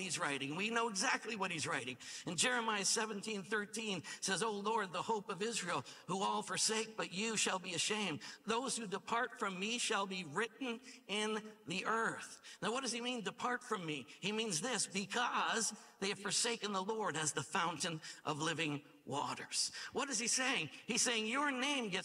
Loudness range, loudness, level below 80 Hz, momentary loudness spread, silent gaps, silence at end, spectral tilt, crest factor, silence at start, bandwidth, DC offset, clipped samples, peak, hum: 3 LU; -38 LUFS; -86 dBFS; 7 LU; none; 0 s; -2 dB/octave; 20 dB; 0 s; 16 kHz; under 0.1%; under 0.1%; -20 dBFS; none